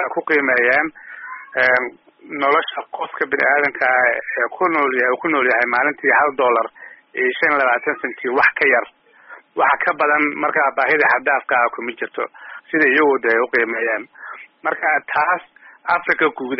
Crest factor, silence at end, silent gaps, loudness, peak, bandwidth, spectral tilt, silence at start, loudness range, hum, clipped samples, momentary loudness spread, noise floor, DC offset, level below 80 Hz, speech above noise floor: 16 dB; 0 s; none; -17 LUFS; -2 dBFS; 5.8 kHz; -1 dB/octave; 0 s; 2 LU; none; under 0.1%; 13 LU; -43 dBFS; under 0.1%; -64 dBFS; 26 dB